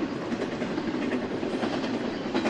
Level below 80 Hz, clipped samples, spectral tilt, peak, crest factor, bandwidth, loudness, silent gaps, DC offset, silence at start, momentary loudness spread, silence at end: -58 dBFS; under 0.1%; -5.5 dB/octave; -14 dBFS; 14 dB; 10 kHz; -30 LUFS; none; under 0.1%; 0 s; 2 LU; 0 s